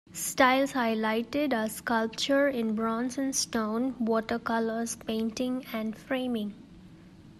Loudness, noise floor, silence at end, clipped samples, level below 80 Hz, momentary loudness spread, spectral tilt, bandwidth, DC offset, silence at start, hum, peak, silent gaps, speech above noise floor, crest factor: -29 LUFS; -51 dBFS; 0 s; under 0.1%; -62 dBFS; 8 LU; -3.5 dB/octave; 14 kHz; under 0.1%; 0.1 s; none; -8 dBFS; none; 23 dB; 20 dB